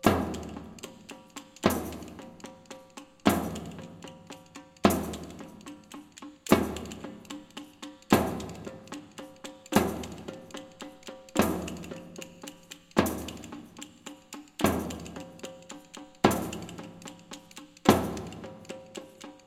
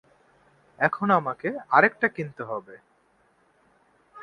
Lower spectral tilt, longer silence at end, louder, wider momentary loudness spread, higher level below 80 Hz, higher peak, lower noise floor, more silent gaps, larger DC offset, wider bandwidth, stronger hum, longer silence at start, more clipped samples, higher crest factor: second, -5 dB/octave vs -8 dB/octave; about the same, 0.1 s vs 0 s; second, -30 LUFS vs -24 LUFS; first, 20 LU vs 15 LU; first, -52 dBFS vs -70 dBFS; about the same, -4 dBFS vs -4 dBFS; second, -50 dBFS vs -64 dBFS; neither; neither; first, 17 kHz vs 10.5 kHz; neither; second, 0.05 s vs 0.8 s; neither; about the same, 28 dB vs 24 dB